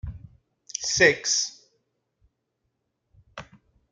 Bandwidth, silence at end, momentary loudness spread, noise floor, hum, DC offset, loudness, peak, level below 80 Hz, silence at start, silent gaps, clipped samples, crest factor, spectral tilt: 11 kHz; 0.5 s; 26 LU; -78 dBFS; none; under 0.1%; -22 LUFS; -4 dBFS; -52 dBFS; 0.05 s; none; under 0.1%; 26 dB; -1.5 dB/octave